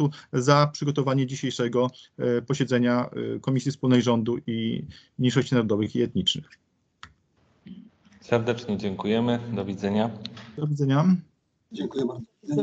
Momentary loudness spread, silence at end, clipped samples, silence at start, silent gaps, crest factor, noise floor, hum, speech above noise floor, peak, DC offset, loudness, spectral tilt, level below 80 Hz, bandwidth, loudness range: 10 LU; 0 s; under 0.1%; 0 s; none; 22 dB; -65 dBFS; none; 40 dB; -4 dBFS; under 0.1%; -25 LUFS; -6.5 dB/octave; -62 dBFS; 8.2 kHz; 5 LU